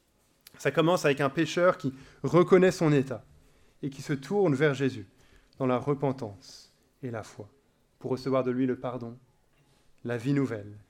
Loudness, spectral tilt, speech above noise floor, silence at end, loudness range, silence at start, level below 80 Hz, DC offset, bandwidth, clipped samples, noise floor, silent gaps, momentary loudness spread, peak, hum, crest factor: -28 LUFS; -6.5 dB/octave; 38 dB; 0.1 s; 8 LU; 0.6 s; -64 dBFS; under 0.1%; 16 kHz; under 0.1%; -65 dBFS; none; 18 LU; -8 dBFS; none; 20 dB